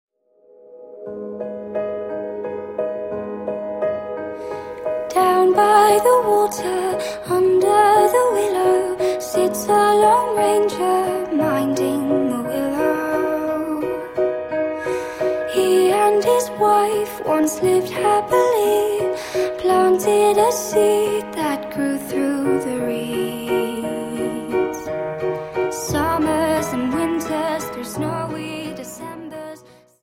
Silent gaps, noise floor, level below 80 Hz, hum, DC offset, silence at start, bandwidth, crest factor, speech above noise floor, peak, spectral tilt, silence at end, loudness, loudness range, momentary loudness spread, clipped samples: none; -54 dBFS; -52 dBFS; none; under 0.1%; 0.7 s; 16.5 kHz; 16 dB; 37 dB; -2 dBFS; -4.5 dB/octave; 0.45 s; -19 LUFS; 9 LU; 13 LU; under 0.1%